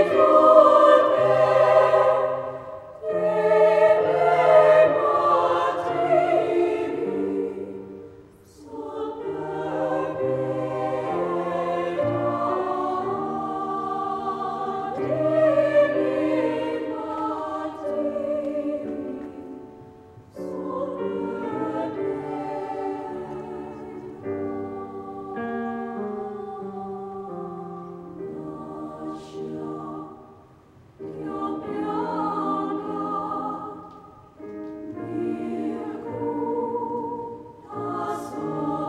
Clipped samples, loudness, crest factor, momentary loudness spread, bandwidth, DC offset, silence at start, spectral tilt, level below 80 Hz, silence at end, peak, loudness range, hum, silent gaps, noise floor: under 0.1%; -23 LUFS; 22 dB; 19 LU; 9.8 kHz; under 0.1%; 0 s; -7 dB/octave; -62 dBFS; 0 s; -2 dBFS; 14 LU; none; none; -52 dBFS